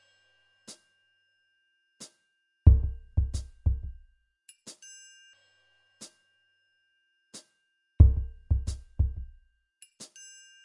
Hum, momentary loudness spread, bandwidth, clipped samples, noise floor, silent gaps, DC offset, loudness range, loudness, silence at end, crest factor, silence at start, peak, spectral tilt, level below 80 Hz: none; 27 LU; 11 kHz; under 0.1%; -76 dBFS; none; under 0.1%; 10 LU; -27 LUFS; 0.6 s; 26 dB; 0.7 s; -4 dBFS; -7 dB/octave; -32 dBFS